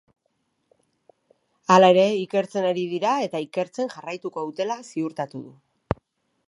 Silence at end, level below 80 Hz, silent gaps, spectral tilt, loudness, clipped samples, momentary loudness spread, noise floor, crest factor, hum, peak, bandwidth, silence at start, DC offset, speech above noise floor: 1 s; -54 dBFS; none; -5.5 dB/octave; -23 LUFS; under 0.1%; 16 LU; -73 dBFS; 22 dB; none; -2 dBFS; 11.5 kHz; 1.7 s; under 0.1%; 51 dB